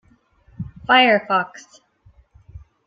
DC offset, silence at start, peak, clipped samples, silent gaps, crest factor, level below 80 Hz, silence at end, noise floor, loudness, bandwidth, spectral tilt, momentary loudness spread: under 0.1%; 0.6 s; -2 dBFS; under 0.1%; none; 20 dB; -52 dBFS; 0.3 s; -56 dBFS; -16 LUFS; 7.6 kHz; -4.5 dB/octave; 22 LU